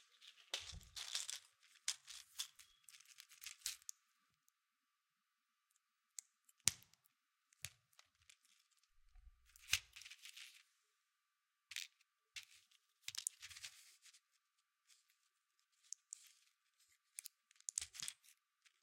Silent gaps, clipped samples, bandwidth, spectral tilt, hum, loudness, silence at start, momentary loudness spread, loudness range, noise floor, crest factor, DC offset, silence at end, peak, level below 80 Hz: none; under 0.1%; 16.5 kHz; 1.5 dB/octave; none; -48 LUFS; 0 s; 22 LU; 8 LU; -89 dBFS; 46 dB; under 0.1%; 0.15 s; -8 dBFS; -78 dBFS